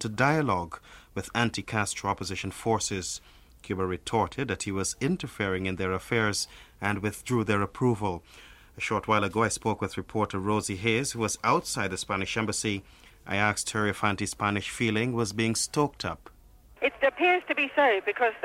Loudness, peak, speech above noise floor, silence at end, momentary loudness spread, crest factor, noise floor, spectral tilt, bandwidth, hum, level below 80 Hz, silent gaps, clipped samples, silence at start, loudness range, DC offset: -28 LUFS; -6 dBFS; 26 dB; 0 s; 9 LU; 22 dB; -54 dBFS; -4 dB/octave; 16 kHz; none; -54 dBFS; none; under 0.1%; 0 s; 3 LU; under 0.1%